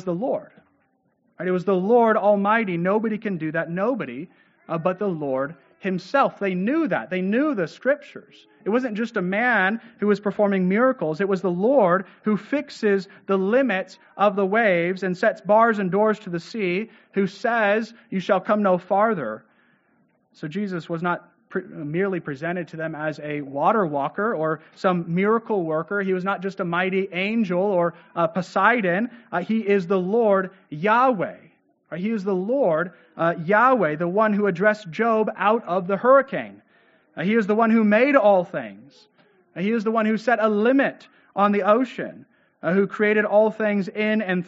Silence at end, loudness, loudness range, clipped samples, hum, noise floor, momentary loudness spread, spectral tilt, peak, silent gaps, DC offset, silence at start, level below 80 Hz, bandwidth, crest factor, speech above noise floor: 0 s; -22 LUFS; 5 LU; under 0.1%; none; -67 dBFS; 11 LU; -5.5 dB/octave; -2 dBFS; none; under 0.1%; 0.05 s; -74 dBFS; 7.8 kHz; 20 dB; 45 dB